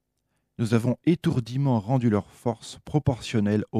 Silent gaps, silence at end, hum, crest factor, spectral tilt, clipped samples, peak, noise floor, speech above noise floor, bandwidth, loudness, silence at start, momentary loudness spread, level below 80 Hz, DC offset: none; 0 s; none; 18 dB; -7.5 dB/octave; under 0.1%; -8 dBFS; -76 dBFS; 51 dB; 13.5 kHz; -25 LUFS; 0.6 s; 8 LU; -54 dBFS; under 0.1%